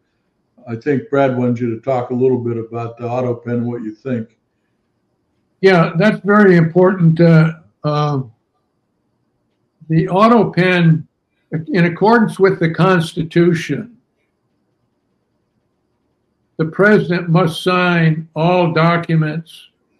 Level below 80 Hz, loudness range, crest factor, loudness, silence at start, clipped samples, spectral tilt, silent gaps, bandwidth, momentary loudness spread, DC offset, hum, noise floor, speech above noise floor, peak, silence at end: -58 dBFS; 8 LU; 16 dB; -15 LUFS; 0.65 s; under 0.1%; -8 dB/octave; none; 11 kHz; 13 LU; under 0.1%; none; -66 dBFS; 53 dB; 0 dBFS; 0.45 s